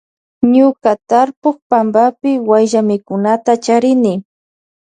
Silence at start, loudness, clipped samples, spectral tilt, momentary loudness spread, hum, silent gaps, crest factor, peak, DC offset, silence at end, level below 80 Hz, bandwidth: 0.4 s; -13 LUFS; under 0.1%; -6 dB/octave; 6 LU; none; 1.37-1.42 s, 1.62-1.70 s; 12 dB; 0 dBFS; under 0.1%; 0.65 s; -62 dBFS; 9.6 kHz